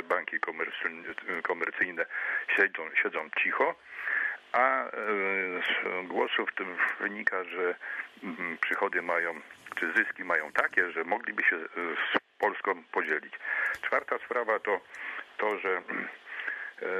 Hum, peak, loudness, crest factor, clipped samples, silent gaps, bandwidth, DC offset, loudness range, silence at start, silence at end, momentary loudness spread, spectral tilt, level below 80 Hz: none; -10 dBFS; -30 LUFS; 22 dB; under 0.1%; none; 13.5 kHz; under 0.1%; 3 LU; 0 s; 0 s; 9 LU; -4 dB/octave; -78 dBFS